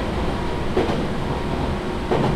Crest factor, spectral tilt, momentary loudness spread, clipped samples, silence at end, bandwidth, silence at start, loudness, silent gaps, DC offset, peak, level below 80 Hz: 14 dB; -7 dB/octave; 3 LU; under 0.1%; 0 s; 13 kHz; 0 s; -24 LUFS; none; under 0.1%; -8 dBFS; -30 dBFS